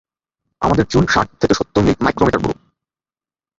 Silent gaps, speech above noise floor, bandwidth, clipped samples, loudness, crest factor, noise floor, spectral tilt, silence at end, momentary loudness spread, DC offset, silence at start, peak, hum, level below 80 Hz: none; over 75 dB; 7.8 kHz; under 0.1%; -16 LUFS; 16 dB; under -90 dBFS; -6 dB/octave; 1.05 s; 7 LU; under 0.1%; 0.6 s; -2 dBFS; none; -36 dBFS